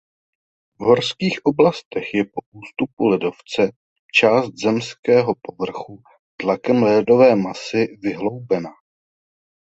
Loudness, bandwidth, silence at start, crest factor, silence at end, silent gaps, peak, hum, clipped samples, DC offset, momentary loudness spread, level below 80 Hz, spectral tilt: -19 LUFS; 8.2 kHz; 0.8 s; 18 dB; 1 s; 1.85-1.91 s, 2.46-2.52 s, 2.93-2.97 s, 3.76-4.09 s, 4.99-5.03 s, 6.19-6.38 s; -2 dBFS; none; under 0.1%; under 0.1%; 13 LU; -60 dBFS; -6 dB/octave